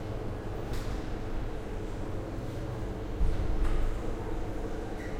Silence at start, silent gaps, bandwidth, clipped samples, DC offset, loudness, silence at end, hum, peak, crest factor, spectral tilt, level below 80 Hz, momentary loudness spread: 0 s; none; 10.5 kHz; under 0.1%; under 0.1%; -37 LUFS; 0 s; none; -16 dBFS; 14 dB; -7 dB/octave; -34 dBFS; 5 LU